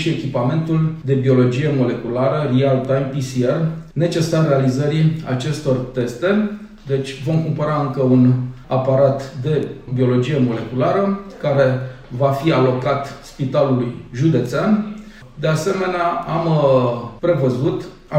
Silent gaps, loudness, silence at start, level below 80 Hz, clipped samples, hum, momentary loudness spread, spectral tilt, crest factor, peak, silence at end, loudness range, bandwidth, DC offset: none; -18 LUFS; 0 s; -46 dBFS; under 0.1%; none; 8 LU; -7.5 dB/octave; 14 dB; -4 dBFS; 0 s; 2 LU; 11 kHz; under 0.1%